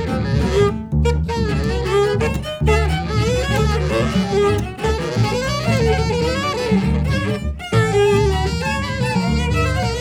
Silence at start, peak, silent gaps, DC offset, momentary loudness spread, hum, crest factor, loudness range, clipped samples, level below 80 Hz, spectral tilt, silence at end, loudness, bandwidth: 0 s; -4 dBFS; none; under 0.1%; 4 LU; none; 14 dB; 1 LU; under 0.1%; -26 dBFS; -6 dB/octave; 0 s; -18 LUFS; 15.5 kHz